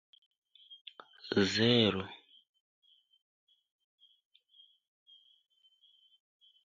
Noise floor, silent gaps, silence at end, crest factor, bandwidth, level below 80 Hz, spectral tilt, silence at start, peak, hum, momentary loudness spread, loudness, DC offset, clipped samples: -68 dBFS; 0.81-0.85 s; 4.5 s; 26 dB; 7.6 kHz; -68 dBFS; -5 dB/octave; 0.7 s; -12 dBFS; none; 26 LU; -29 LUFS; under 0.1%; under 0.1%